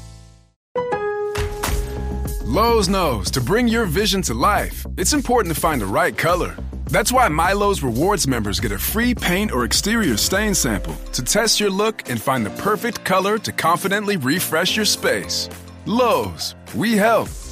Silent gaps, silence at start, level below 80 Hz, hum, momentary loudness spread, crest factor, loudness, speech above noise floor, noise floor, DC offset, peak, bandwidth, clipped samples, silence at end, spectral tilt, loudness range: 0.56-0.75 s; 0 s; -32 dBFS; none; 8 LU; 14 dB; -19 LUFS; 24 dB; -43 dBFS; under 0.1%; -6 dBFS; 15.5 kHz; under 0.1%; 0 s; -3.5 dB/octave; 1 LU